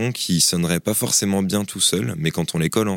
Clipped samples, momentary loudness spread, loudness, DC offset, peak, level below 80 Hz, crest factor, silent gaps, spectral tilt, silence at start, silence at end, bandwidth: under 0.1%; 6 LU; -19 LUFS; under 0.1%; -4 dBFS; -50 dBFS; 16 dB; none; -3.5 dB/octave; 0 s; 0 s; 17 kHz